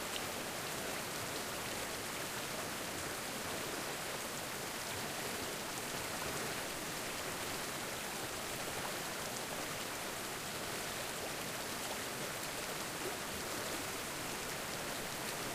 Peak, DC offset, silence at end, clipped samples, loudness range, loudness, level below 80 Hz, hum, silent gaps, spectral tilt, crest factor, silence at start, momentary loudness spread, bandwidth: -22 dBFS; under 0.1%; 0 s; under 0.1%; 0 LU; -40 LUFS; -64 dBFS; none; none; -2 dB/octave; 18 dB; 0 s; 1 LU; 15.5 kHz